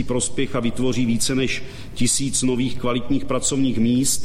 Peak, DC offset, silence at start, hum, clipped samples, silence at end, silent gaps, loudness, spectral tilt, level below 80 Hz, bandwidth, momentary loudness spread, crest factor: -6 dBFS; under 0.1%; 0 s; none; under 0.1%; 0 s; none; -21 LUFS; -4 dB/octave; -38 dBFS; 15.5 kHz; 5 LU; 14 dB